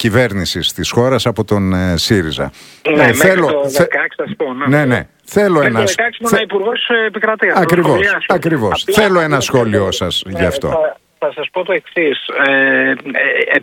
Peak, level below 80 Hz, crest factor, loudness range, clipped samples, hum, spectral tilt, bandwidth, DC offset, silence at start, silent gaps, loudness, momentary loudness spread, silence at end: 0 dBFS; -42 dBFS; 14 dB; 2 LU; 0.1%; none; -4.5 dB/octave; 18 kHz; under 0.1%; 0 s; none; -13 LUFS; 8 LU; 0 s